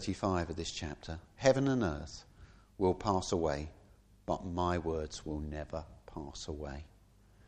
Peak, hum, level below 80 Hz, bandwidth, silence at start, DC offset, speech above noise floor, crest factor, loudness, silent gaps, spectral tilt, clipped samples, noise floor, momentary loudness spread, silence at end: -14 dBFS; none; -50 dBFS; 9.8 kHz; 0 s; under 0.1%; 28 dB; 22 dB; -35 LUFS; none; -5.5 dB/octave; under 0.1%; -62 dBFS; 17 LU; 0.05 s